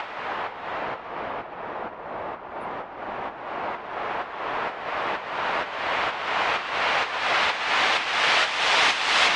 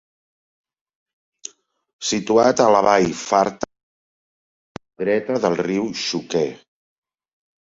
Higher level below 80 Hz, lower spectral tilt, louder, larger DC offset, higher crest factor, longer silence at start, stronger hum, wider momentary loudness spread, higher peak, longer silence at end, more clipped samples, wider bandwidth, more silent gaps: about the same, -60 dBFS vs -60 dBFS; second, -1 dB/octave vs -4 dB/octave; second, -25 LUFS vs -19 LUFS; neither; about the same, 20 dB vs 22 dB; second, 0 s vs 2 s; neither; second, 15 LU vs 18 LU; second, -6 dBFS vs -2 dBFS; second, 0 s vs 1.15 s; neither; first, 11.5 kHz vs 8 kHz; second, none vs 3.83-4.75 s